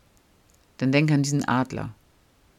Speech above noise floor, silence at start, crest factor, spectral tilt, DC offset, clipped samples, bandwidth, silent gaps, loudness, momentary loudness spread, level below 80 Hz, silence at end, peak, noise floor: 37 dB; 0.8 s; 20 dB; -6 dB/octave; under 0.1%; under 0.1%; 13.5 kHz; none; -24 LUFS; 13 LU; -58 dBFS; 0.65 s; -6 dBFS; -60 dBFS